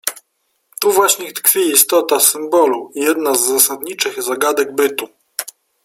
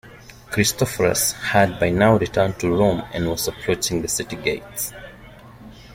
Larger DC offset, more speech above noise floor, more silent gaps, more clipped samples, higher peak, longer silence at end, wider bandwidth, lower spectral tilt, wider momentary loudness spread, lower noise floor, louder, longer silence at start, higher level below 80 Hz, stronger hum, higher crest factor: neither; first, 52 dB vs 23 dB; neither; neither; about the same, 0 dBFS vs -2 dBFS; first, 0.35 s vs 0 s; first, over 20 kHz vs 16.5 kHz; second, -0.5 dB/octave vs -4 dB/octave; first, 15 LU vs 10 LU; first, -67 dBFS vs -43 dBFS; first, -14 LUFS vs -20 LUFS; about the same, 0.05 s vs 0.05 s; second, -66 dBFS vs -44 dBFS; neither; about the same, 16 dB vs 20 dB